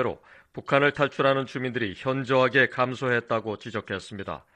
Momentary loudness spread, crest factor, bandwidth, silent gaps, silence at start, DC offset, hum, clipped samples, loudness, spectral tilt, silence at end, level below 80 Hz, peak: 14 LU; 20 dB; 9.4 kHz; none; 0 s; under 0.1%; none; under 0.1%; -25 LUFS; -6 dB/octave; 0.2 s; -62 dBFS; -6 dBFS